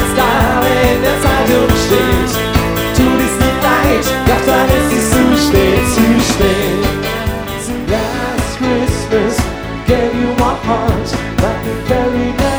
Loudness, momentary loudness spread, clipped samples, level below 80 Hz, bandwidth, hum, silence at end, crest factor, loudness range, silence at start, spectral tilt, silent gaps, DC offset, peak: -13 LUFS; 7 LU; under 0.1%; -22 dBFS; over 20 kHz; none; 0 s; 12 dB; 4 LU; 0 s; -5 dB/octave; none; under 0.1%; 0 dBFS